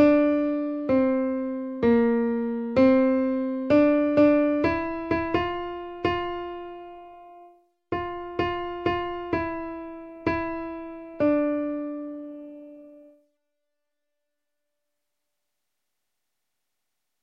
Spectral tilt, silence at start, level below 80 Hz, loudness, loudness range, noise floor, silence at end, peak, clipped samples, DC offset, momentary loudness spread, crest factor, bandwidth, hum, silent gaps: -8.5 dB/octave; 0 s; -52 dBFS; -25 LUFS; 10 LU; -84 dBFS; 4.2 s; -8 dBFS; under 0.1%; under 0.1%; 18 LU; 18 dB; 6 kHz; none; none